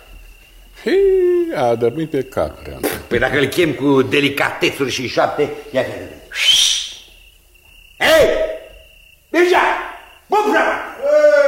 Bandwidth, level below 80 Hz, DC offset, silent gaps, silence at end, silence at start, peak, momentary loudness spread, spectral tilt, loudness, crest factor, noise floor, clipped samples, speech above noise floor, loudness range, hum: 16.5 kHz; -42 dBFS; under 0.1%; none; 0 s; 0.1 s; 0 dBFS; 12 LU; -3.5 dB/octave; -16 LUFS; 16 dB; -47 dBFS; under 0.1%; 31 dB; 1 LU; none